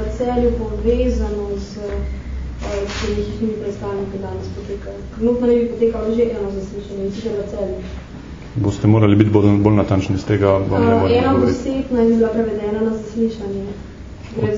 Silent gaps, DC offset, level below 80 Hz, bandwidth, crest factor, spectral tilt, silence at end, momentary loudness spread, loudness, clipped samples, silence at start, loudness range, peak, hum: none; under 0.1%; -30 dBFS; 7.6 kHz; 18 dB; -8 dB/octave; 0 s; 15 LU; -19 LUFS; under 0.1%; 0 s; 9 LU; 0 dBFS; none